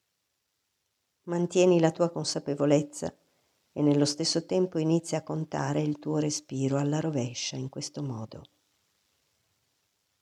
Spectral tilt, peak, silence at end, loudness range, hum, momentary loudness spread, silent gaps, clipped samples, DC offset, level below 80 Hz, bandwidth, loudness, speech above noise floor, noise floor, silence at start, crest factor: -5.5 dB/octave; -10 dBFS; 1.75 s; 7 LU; none; 12 LU; none; under 0.1%; under 0.1%; -72 dBFS; 12 kHz; -28 LUFS; 51 dB; -79 dBFS; 1.25 s; 20 dB